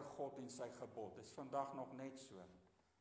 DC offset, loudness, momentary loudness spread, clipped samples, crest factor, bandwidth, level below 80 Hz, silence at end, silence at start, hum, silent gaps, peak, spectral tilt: under 0.1%; -51 LUFS; 12 LU; under 0.1%; 20 dB; 8 kHz; -84 dBFS; 0.3 s; 0 s; none; none; -30 dBFS; -5 dB/octave